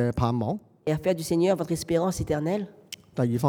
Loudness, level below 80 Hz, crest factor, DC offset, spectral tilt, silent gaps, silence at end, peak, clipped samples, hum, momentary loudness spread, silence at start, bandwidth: -27 LUFS; -50 dBFS; 18 dB; under 0.1%; -6.5 dB/octave; none; 0 s; -8 dBFS; under 0.1%; none; 8 LU; 0 s; over 20 kHz